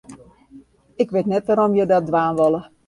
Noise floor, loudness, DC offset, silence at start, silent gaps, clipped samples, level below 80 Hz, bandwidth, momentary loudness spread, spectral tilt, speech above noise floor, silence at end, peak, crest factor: -47 dBFS; -19 LUFS; under 0.1%; 0.1 s; none; under 0.1%; -58 dBFS; 11.5 kHz; 4 LU; -8 dB/octave; 30 dB; 0.25 s; -4 dBFS; 16 dB